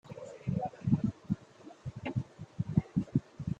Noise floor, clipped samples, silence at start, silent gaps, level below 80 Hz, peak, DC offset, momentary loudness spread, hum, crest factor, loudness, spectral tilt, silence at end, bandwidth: -54 dBFS; under 0.1%; 0.05 s; none; -58 dBFS; -12 dBFS; under 0.1%; 15 LU; none; 22 dB; -35 LUFS; -9 dB/octave; 0.05 s; 8.2 kHz